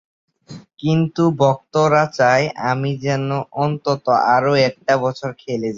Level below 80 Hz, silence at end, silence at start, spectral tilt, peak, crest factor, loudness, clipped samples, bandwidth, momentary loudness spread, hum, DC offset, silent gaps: -58 dBFS; 0 s; 0.5 s; -6.5 dB/octave; -2 dBFS; 16 dB; -18 LUFS; under 0.1%; 7.6 kHz; 8 LU; none; under 0.1%; none